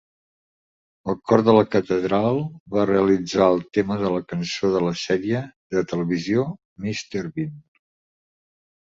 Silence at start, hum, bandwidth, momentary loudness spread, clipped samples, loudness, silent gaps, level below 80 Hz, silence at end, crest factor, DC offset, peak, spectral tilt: 1.05 s; none; 7.8 kHz; 11 LU; under 0.1%; -22 LUFS; 2.60-2.66 s, 5.56-5.70 s, 6.65-6.76 s; -56 dBFS; 1.2 s; 20 dB; under 0.1%; -2 dBFS; -6.5 dB/octave